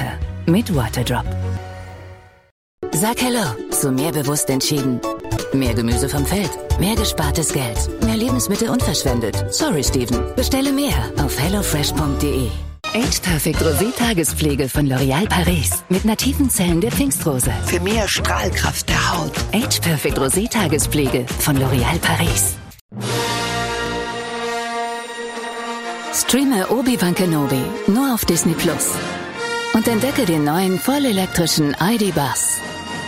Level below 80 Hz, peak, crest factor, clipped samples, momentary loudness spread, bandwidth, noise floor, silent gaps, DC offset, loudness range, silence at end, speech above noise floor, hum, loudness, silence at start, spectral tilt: -30 dBFS; -4 dBFS; 16 dB; under 0.1%; 7 LU; 16.5 kHz; -40 dBFS; 2.51-2.78 s, 22.81-22.89 s; under 0.1%; 4 LU; 0 s; 22 dB; none; -18 LUFS; 0 s; -4 dB/octave